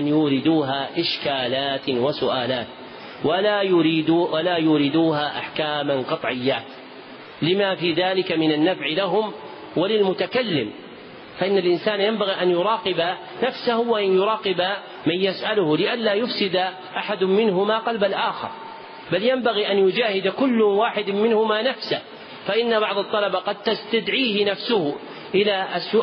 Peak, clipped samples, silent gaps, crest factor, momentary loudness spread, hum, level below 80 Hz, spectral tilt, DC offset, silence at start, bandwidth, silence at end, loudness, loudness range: -8 dBFS; under 0.1%; none; 14 dB; 9 LU; none; -66 dBFS; -3 dB/octave; under 0.1%; 0 s; 5.6 kHz; 0 s; -21 LUFS; 2 LU